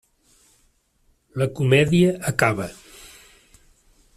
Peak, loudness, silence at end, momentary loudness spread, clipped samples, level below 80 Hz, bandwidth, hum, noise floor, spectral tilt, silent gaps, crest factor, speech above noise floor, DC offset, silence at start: -2 dBFS; -20 LUFS; 1.45 s; 26 LU; under 0.1%; -52 dBFS; 14.5 kHz; none; -64 dBFS; -6 dB/octave; none; 22 dB; 45 dB; under 0.1%; 1.35 s